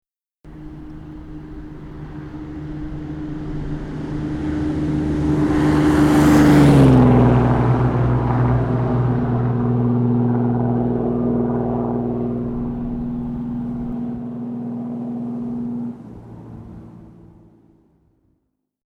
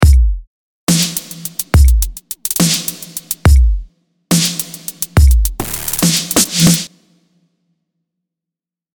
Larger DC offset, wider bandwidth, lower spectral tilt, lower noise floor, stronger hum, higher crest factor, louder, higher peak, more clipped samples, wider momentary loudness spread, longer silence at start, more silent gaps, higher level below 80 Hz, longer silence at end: neither; second, 13.5 kHz vs 19.5 kHz; first, -8.5 dB/octave vs -4 dB/octave; second, -71 dBFS vs -86 dBFS; neither; about the same, 16 dB vs 14 dB; second, -18 LUFS vs -14 LUFS; second, -4 dBFS vs 0 dBFS; neither; first, 23 LU vs 12 LU; first, 0.45 s vs 0 s; second, none vs 0.47-0.87 s; second, -34 dBFS vs -16 dBFS; second, 1.75 s vs 2.05 s